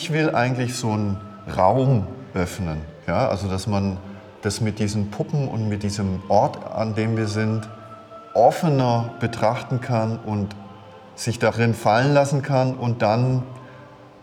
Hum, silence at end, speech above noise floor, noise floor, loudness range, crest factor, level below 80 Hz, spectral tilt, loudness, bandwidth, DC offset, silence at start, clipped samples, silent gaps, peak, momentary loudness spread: none; 0.15 s; 23 dB; -44 dBFS; 3 LU; 20 dB; -54 dBFS; -6.5 dB/octave; -22 LUFS; 15.5 kHz; under 0.1%; 0 s; under 0.1%; none; -2 dBFS; 12 LU